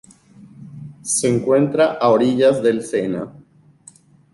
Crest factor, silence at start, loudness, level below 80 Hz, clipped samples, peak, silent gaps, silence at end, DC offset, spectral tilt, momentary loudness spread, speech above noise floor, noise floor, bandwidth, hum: 16 dB; 0.4 s; -17 LUFS; -60 dBFS; under 0.1%; -4 dBFS; none; 1.05 s; under 0.1%; -5 dB/octave; 20 LU; 32 dB; -48 dBFS; 11.5 kHz; none